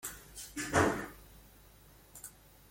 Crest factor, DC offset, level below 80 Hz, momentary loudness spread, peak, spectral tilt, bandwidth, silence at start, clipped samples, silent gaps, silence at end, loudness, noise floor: 26 dB; under 0.1%; -58 dBFS; 25 LU; -12 dBFS; -4 dB/octave; 16.5 kHz; 0.05 s; under 0.1%; none; 0.4 s; -34 LUFS; -59 dBFS